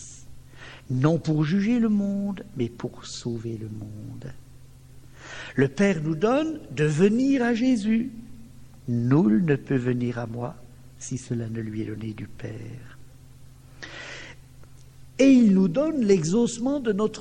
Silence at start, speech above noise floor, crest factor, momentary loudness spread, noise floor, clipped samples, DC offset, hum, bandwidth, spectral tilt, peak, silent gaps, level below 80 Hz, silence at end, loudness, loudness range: 0 s; 24 dB; 18 dB; 20 LU; -48 dBFS; under 0.1%; 0.2%; none; 10.5 kHz; -7 dB/octave; -6 dBFS; none; -54 dBFS; 0 s; -24 LUFS; 12 LU